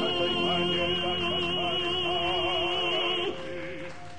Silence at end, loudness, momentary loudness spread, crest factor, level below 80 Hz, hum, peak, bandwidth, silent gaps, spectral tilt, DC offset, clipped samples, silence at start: 0 s; -27 LUFS; 11 LU; 12 dB; -56 dBFS; none; -16 dBFS; 10 kHz; none; -4.5 dB/octave; 0.9%; under 0.1%; 0 s